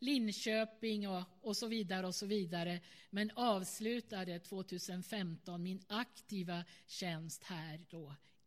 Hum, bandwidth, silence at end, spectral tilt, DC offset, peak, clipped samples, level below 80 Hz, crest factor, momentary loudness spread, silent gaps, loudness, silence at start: none; 16 kHz; 0.3 s; -4.5 dB/octave; under 0.1%; -22 dBFS; under 0.1%; -86 dBFS; 20 dB; 10 LU; none; -41 LUFS; 0 s